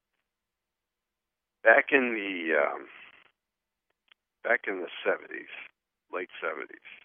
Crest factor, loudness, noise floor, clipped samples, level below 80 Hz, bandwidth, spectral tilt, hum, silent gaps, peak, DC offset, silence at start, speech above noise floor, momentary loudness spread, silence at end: 24 dB; -27 LUFS; -88 dBFS; under 0.1%; under -90 dBFS; 3.6 kHz; -0.5 dB/octave; none; none; -6 dBFS; under 0.1%; 1.65 s; 59 dB; 20 LU; 0.1 s